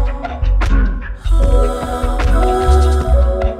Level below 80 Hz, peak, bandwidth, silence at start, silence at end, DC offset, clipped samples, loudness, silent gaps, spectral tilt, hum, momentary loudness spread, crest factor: -14 dBFS; 0 dBFS; 10.5 kHz; 0 s; 0 s; under 0.1%; under 0.1%; -16 LUFS; none; -7 dB/octave; none; 8 LU; 12 dB